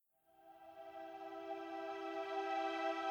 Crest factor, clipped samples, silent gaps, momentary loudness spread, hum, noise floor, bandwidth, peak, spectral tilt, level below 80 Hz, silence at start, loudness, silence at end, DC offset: 16 dB; under 0.1%; none; 18 LU; none; -68 dBFS; over 20 kHz; -28 dBFS; -3 dB/octave; -88 dBFS; 0.4 s; -44 LUFS; 0 s; under 0.1%